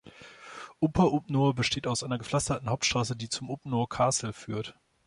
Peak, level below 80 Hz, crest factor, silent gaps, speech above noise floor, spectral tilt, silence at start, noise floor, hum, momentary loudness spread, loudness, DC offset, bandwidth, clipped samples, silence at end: -10 dBFS; -52 dBFS; 20 dB; none; 21 dB; -4.5 dB/octave; 0.05 s; -49 dBFS; none; 18 LU; -29 LUFS; under 0.1%; 11.5 kHz; under 0.1%; 0.35 s